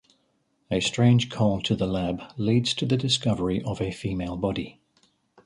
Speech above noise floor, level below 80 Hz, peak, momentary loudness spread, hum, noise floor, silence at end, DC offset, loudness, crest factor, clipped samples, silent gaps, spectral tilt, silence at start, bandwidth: 46 dB; -48 dBFS; -10 dBFS; 9 LU; none; -70 dBFS; 0.75 s; under 0.1%; -25 LUFS; 16 dB; under 0.1%; none; -5.5 dB/octave; 0.7 s; 11 kHz